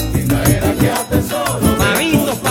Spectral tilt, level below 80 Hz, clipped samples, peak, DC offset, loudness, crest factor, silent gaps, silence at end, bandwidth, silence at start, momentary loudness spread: -5 dB/octave; -28 dBFS; under 0.1%; 0 dBFS; under 0.1%; -15 LUFS; 14 dB; none; 0 s; 17.5 kHz; 0 s; 4 LU